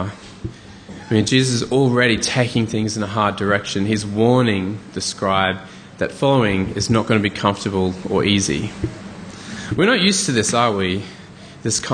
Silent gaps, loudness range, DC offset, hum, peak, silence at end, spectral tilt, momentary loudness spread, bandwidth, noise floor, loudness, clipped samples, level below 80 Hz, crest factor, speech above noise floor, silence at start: none; 2 LU; under 0.1%; none; -2 dBFS; 0 s; -4.5 dB/octave; 17 LU; 10 kHz; -39 dBFS; -18 LUFS; under 0.1%; -46 dBFS; 18 dB; 21 dB; 0 s